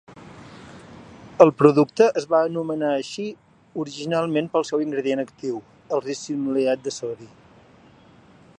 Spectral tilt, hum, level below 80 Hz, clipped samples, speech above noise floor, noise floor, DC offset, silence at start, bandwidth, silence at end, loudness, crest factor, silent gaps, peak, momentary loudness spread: -6 dB/octave; none; -64 dBFS; under 0.1%; 30 dB; -51 dBFS; under 0.1%; 0.1 s; 10 kHz; 1.35 s; -22 LUFS; 22 dB; none; 0 dBFS; 22 LU